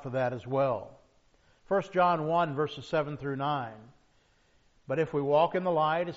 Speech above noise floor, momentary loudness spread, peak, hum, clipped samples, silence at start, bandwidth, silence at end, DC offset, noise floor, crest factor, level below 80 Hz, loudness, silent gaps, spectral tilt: 37 dB; 9 LU; -12 dBFS; none; under 0.1%; 0 s; 7.6 kHz; 0 s; under 0.1%; -66 dBFS; 18 dB; -66 dBFS; -29 LUFS; none; -5 dB/octave